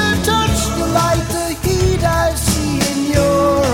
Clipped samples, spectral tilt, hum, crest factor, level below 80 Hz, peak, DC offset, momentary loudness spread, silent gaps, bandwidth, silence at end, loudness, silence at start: under 0.1%; -4.5 dB/octave; none; 14 dB; -26 dBFS; -2 dBFS; under 0.1%; 4 LU; none; 19 kHz; 0 s; -16 LUFS; 0 s